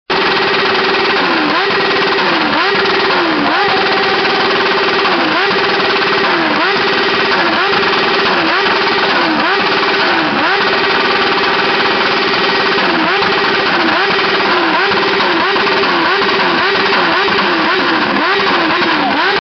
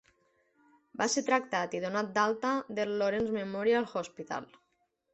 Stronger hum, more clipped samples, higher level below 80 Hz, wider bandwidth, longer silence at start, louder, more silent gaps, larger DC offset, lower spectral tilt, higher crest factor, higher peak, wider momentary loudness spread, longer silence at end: neither; neither; first, -50 dBFS vs -70 dBFS; second, 6.4 kHz vs 8.2 kHz; second, 0.1 s vs 1 s; first, -11 LUFS vs -31 LUFS; neither; neither; second, -0.5 dB/octave vs -3.5 dB/octave; second, 12 dB vs 20 dB; first, 0 dBFS vs -12 dBFS; second, 1 LU vs 10 LU; second, 0 s vs 0.7 s